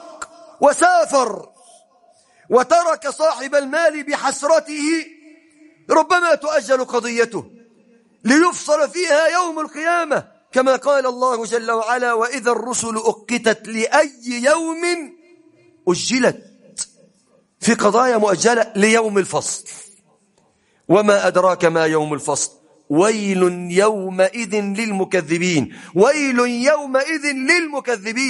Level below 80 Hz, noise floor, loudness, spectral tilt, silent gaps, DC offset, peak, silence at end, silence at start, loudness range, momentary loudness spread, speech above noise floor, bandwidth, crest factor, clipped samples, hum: -66 dBFS; -60 dBFS; -17 LUFS; -3.5 dB/octave; none; under 0.1%; 0 dBFS; 0 s; 0 s; 2 LU; 9 LU; 43 dB; 11.5 kHz; 18 dB; under 0.1%; none